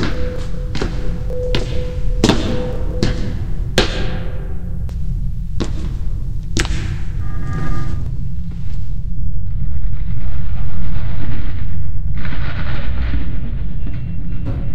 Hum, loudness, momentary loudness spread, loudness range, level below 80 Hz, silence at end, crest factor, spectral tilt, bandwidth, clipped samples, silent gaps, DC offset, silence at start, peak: none; -23 LUFS; 7 LU; 5 LU; -22 dBFS; 0 s; 14 dB; -5.5 dB/octave; 10.5 kHz; under 0.1%; none; under 0.1%; 0 s; 0 dBFS